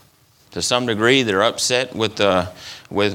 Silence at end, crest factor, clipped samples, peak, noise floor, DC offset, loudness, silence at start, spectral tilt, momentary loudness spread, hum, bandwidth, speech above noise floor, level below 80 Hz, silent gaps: 0 s; 18 dB; under 0.1%; 0 dBFS; -54 dBFS; under 0.1%; -18 LUFS; 0.5 s; -3.5 dB/octave; 13 LU; none; 18.5 kHz; 36 dB; -56 dBFS; none